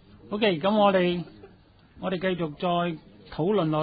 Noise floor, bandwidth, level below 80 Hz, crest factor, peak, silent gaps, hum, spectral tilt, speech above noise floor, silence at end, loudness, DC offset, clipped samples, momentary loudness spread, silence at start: -55 dBFS; 5 kHz; -58 dBFS; 16 dB; -10 dBFS; none; none; -10.5 dB/octave; 31 dB; 0 s; -26 LUFS; under 0.1%; under 0.1%; 15 LU; 0.25 s